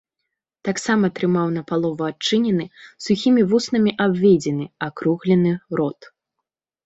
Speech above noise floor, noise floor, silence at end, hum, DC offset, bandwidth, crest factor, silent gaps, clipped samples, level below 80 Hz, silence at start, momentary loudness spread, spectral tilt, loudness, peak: 62 dB; -82 dBFS; 0.95 s; none; under 0.1%; 8.2 kHz; 16 dB; none; under 0.1%; -62 dBFS; 0.65 s; 10 LU; -6 dB/octave; -20 LUFS; -4 dBFS